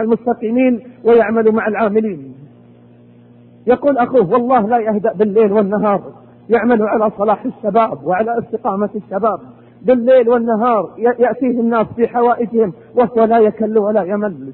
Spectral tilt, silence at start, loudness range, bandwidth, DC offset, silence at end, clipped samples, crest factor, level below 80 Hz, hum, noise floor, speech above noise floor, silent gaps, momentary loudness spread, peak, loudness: -12 dB/octave; 0 s; 2 LU; 4.2 kHz; under 0.1%; 0 s; under 0.1%; 12 dB; -54 dBFS; none; -43 dBFS; 29 dB; none; 7 LU; -2 dBFS; -15 LUFS